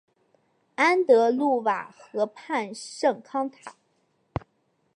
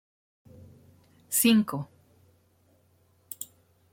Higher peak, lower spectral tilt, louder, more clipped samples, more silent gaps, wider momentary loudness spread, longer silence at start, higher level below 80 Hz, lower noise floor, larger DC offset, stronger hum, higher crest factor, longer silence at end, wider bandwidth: first, -6 dBFS vs -10 dBFS; first, -5 dB/octave vs -3.5 dB/octave; about the same, -25 LUFS vs -26 LUFS; neither; neither; second, 18 LU vs 22 LU; second, 0.8 s vs 1.3 s; first, -60 dBFS vs -70 dBFS; first, -71 dBFS vs -65 dBFS; neither; neither; about the same, 20 dB vs 22 dB; first, 1.25 s vs 0.5 s; second, 11 kHz vs 16.5 kHz